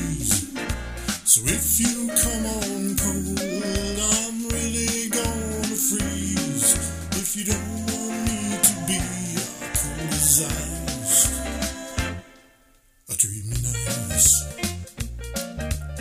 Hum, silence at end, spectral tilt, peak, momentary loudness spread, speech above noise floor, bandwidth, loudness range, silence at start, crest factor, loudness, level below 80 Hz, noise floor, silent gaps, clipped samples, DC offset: none; 0 s; -3 dB/octave; -2 dBFS; 12 LU; 35 dB; 16 kHz; 3 LU; 0 s; 22 dB; -22 LUFS; -36 dBFS; -58 dBFS; none; under 0.1%; under 0.1%